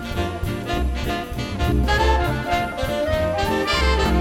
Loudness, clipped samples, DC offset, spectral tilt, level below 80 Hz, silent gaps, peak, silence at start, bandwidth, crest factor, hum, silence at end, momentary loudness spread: -22 LUFS; under 0.1%; under 0.1%; -5.5 dB/octave; -26 dBFS; none; -6 dBFS; 0 s; 16 kHz; 14 dB; none; 0 s; 7 LU